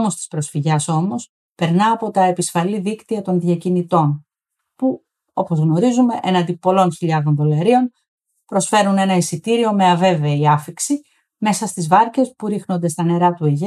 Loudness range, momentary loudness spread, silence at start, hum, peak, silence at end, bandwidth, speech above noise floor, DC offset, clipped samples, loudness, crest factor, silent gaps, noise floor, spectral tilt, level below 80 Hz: 3 LU; 9 LU; 0 s; none; -2 dBFS; 0 s; 13.5 kHz; 62 dB; under 0.1%; under 0.1%; -17 LUFS; 14 dB; 1.29-1.56 s, 8.08-8.18 s; -79 dBFS; -6 dB/octave; -68 dBFS